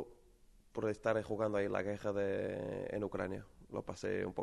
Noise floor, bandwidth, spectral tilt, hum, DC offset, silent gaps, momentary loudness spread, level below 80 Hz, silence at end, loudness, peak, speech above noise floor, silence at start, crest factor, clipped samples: -64 dBFS; 12 kHz; -6.5 dB/octave; none; under 0.1%; none; 10 LU; -64 dBFS; 0 s; -39 LUFS; -20 dBFS; 26 dB; 0 s; 18 dB; under 0.1%